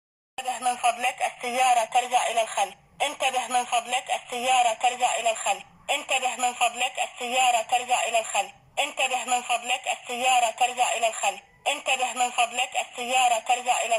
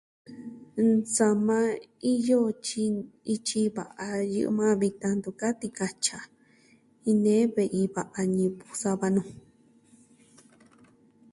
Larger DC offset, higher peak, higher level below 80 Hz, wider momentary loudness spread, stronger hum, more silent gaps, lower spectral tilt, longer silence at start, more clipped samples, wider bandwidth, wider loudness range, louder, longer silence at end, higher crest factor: neither; about the same, -10 dBFS vs -10 dBFS; about the same, -74 dBFS vs -70 dBFS; second, 7 LU vs 10 LU; neither; neither; second, 1 dB/octave vs -5 dB/octave; about the same, 0.4 s vs 0.3 s; neither; first, 16 kHz vs 11.5 kHz; second, 1 LU vs 4 LU; about the same, -25 LUFS vs -27 LUFS; second, 0 s vs 1.95 s; about the same, 16 dB vs 18 dB